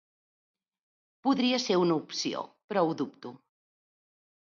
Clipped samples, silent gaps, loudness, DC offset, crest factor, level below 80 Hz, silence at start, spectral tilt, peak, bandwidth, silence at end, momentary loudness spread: under 0.1%; 2.64-2.68 s; -29 LUFS; under 0.1%; 18 dB; -80 dBFS; 1.25 s; -4.5 dB/octave; -14 dBFS; 7.4 kHz; 1.15 s; 12 LU